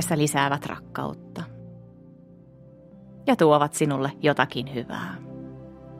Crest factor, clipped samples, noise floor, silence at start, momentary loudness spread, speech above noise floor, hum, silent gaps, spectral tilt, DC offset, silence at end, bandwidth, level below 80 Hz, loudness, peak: 24 dB; under 0.1%; -49 dBFS; 0 s; 21 LU; 26 dB; none; none; -5 dB/octave; under 0.1%; 0 s; 16 kHz; -60 dBFS; -24 LUFS; -2 dBFS